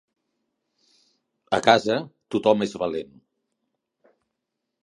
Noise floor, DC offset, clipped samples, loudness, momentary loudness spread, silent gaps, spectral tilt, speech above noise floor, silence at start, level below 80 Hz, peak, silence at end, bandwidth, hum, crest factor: -81 dBFS; under 0.1%; under 0.1%; -23 LUFS; 12 LU; none; -4.5 dB/octave; 60 dB; 1.5 s; -64 dBFS; 0 dBFS; 1.8 s; 11.5 kHz; none; 26 dB